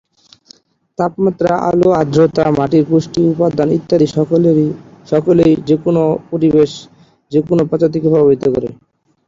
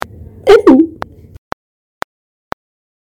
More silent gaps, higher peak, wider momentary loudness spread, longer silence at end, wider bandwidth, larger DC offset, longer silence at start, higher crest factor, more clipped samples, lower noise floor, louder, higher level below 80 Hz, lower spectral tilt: neither; about the same, 0 dBFS vs 0 dBFS; second, 7 LU vs 24 LU; second, 0.55 s vs 2.1 s; second, 7.6 kHz vs 14.5 kHz; neither; first, 1 s vs 0.45 s; about the same, 12 dB vs 14 dB; second, under 0.1% vs 2%; first, -47 dBFS vs -30 dBFS; second, -13 LUFS vs -9 LUFS; about the same, -46 dBFS vs -42 dBFS; first, -8 dB/octave vs -6 dB/octave